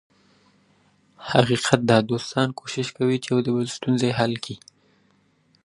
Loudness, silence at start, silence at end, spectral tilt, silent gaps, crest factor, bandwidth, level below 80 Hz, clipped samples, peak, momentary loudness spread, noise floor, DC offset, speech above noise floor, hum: -22 LUFS; 1.2 s; 1.1 s; -5.5 dB/octave; none; 24 dB; 11.5 kHz; -60 dBFS; under 0.1%; 0 dBFS; 11 LU; -63 dBFS; under 0.1%; 41 dB; none